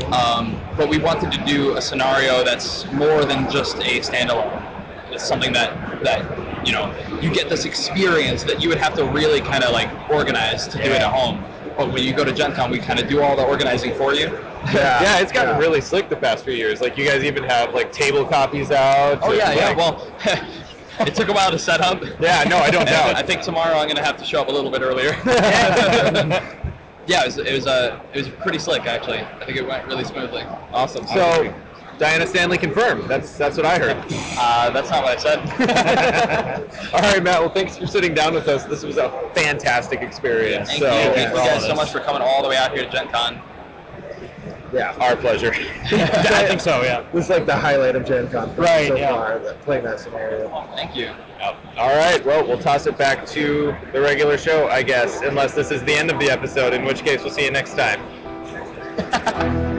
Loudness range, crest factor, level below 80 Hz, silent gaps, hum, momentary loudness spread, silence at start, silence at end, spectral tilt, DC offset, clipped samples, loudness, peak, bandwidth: 4 LU; 12 dB; -42 dBFS; none; none; 11 LU; 0 s; 0 s; -4 dB/octave; under 0.1%; under 0.1%; -18 LUFS; -6 dBFS; 8 kHz